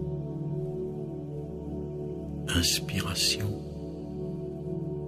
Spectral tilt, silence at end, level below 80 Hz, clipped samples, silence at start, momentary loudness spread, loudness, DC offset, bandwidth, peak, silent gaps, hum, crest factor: -4 dB/octave; 0 s; -46 dBFS; under 0.1%; 0 s; 12 LU; -31 LUFS; under 0.1%; 15.5 kHz; -12 dBFS; none; none; 20 dB